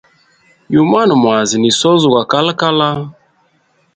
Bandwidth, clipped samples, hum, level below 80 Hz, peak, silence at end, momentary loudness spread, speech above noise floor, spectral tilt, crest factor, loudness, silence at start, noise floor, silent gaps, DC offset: 9.4 kHz; under 0.1%; none; -54 dBFS; 0 dBFS; 0.85 s; 6 LU; 45 dB; -4.5 dB/octave; 14 dB; -12 LUFS; 0.7 s; -57 dBFS; none; under 0.1%